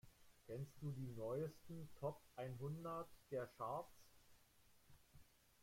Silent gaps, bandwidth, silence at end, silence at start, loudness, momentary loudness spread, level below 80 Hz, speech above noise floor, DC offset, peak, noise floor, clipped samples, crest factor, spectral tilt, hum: none; 16.5 kHz; 0 s; 0.05 s; -51 LUFS; 8 LU; -76 dBFS; 23 dB; under 0.1%; -34 dBFS; -72 dBFS; under 0.1%; 18 dB; -7.5 dB/octave; none